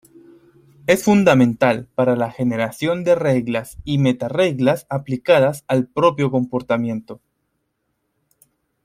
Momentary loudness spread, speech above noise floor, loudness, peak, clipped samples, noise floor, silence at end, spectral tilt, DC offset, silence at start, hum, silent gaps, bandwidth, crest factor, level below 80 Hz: 9 LU; 54 dB; -18 LUFS; 0 dBFS; under 0.1%; -72 dBFS; 1.7 s; -6.5 dB/octave; under 0.1%; 0.9 s; none; none; 16 kHz; 18 dB; -52 dBFS